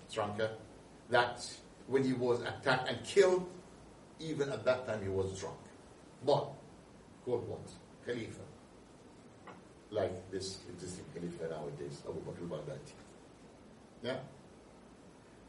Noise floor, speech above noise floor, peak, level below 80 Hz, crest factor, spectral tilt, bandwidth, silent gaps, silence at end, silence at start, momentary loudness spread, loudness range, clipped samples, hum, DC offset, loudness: -58 dBFS; 22 dB; -14 dBFS; -68 dBFS; 24 dB; -5 dB/octave; 11.5 kHz; none; 0 s; 0 s; 25 LU; 12 LU; under 0.1%; none; under 0.1%; -37 LUFS